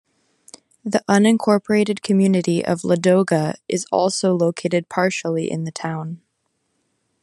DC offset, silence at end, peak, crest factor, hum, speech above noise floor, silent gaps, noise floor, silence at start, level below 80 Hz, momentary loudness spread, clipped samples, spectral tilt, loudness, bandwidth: under 0.1%; 1.05 s; -2 dBFS; 18 dB; none; 53 dB; none; -71 dBFS; 0.85 s; -66 dBFS; 11 LU; under 0.1%; -5.5 dB/octave; -19 LUFS; 12 kHz